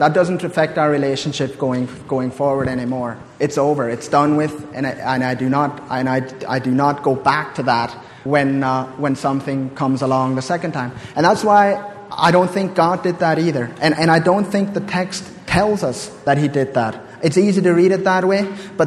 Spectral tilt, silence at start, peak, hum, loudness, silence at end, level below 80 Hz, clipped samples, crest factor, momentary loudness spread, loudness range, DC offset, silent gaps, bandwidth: -6 dB/octave; 0 s; 0 dBFS; none; -18 LUFS; 0 s; -50 dBFS; under 0.1%; 18 dB; 9 LU; 3 LU; under 0.1%; none; 13 kHz